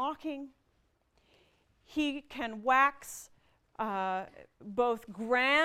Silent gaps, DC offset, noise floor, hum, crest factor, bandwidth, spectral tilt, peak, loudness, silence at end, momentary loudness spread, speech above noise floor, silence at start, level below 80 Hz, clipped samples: none; under 0.1%; -73 dBFS; none; 20 dB; 16 kHz; -3.5 dB/octave; -12 dBFS; -32 LUFS; 0 s; 21 LU; 41 dB; 0 s; -68 dBFS; under 0.1%